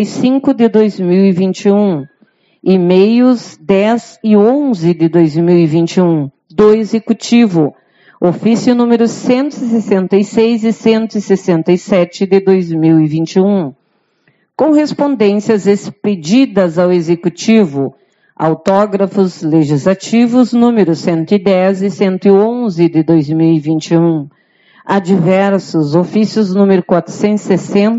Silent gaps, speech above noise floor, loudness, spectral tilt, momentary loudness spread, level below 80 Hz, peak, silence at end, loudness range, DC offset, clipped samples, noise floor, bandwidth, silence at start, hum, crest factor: none; 46 dB; -11 LUFS; -7 dB/octave; 6 LU; -56 dBFS; 0 dBFS; 0 s; 2 LU; under 0.1%; under 0.1%; -57 dBFS; 8 kHz; 0 s; none; 10 dB